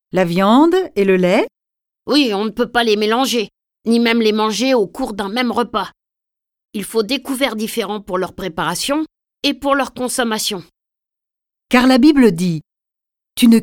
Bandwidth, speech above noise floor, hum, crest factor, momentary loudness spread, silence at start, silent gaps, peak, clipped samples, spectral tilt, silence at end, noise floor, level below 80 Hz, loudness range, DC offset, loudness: 18.5 kHz; 69 dB; none; 16 dB; 12 LU; 0.15 s; none; 0 dBFS; under 0.1%; -4.5 dB/octave; 0 s; -85 dBFS; -50 dBFS; 6 LU; under 0.1%; -16 LUFS